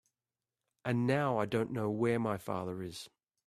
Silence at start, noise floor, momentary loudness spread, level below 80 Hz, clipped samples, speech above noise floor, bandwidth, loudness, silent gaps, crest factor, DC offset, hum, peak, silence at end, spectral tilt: 0.85 s; under -90 dBFS; 13 LU; -72 dBFS; under 0.1%; over 57 dB; 14.5 kHz; -34 LUFS; none; 18 dB; under 0.1%; none; -16 dBFS; 0.4 s; -7 dB/octave